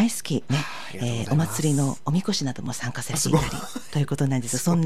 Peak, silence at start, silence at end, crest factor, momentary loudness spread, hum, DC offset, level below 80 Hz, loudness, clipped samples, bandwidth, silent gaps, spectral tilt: -8 dBFS; 0 s; 0 s; 16 dB; 8 LU; none; 2%; -48 dBFS; -25 LUFS; under 0.1%; 15.5 kHz; none; -5 dB/octave